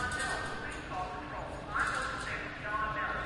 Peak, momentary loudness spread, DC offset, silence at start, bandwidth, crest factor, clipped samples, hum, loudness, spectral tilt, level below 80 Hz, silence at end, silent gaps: -20 dBFS; 7 LU; under 0.1%; 0 s; 11.5 kHz; 16 dB; under 0.1%; none; -36 LUFS; -3.5 dB/octave; -50 dBFS; 0 s; none